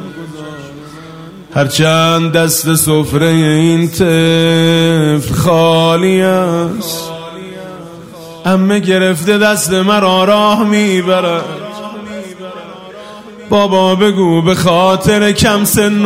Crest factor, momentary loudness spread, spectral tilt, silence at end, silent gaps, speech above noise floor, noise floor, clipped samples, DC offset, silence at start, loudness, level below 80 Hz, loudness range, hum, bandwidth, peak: 12 dB; 20 LU; -5 dB/octave; 0 s; none; 21 dB; -31 dBFS; under 0.1%; under 0.1%; 0 s; -10 LUFS; -40 dBFS; 5 LU; none; 16 kHz; 0 dBFS